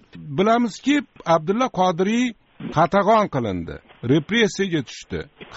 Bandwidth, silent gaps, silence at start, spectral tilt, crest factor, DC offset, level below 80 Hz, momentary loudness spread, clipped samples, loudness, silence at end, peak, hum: 8 kHz; none; 0.15 s; -4.5 dB/octave; 16 dB; under 0.1%; -52 dBFS; 14 LU; under 0.1%; -20 LUFS; 0 s; -6 dBFS; none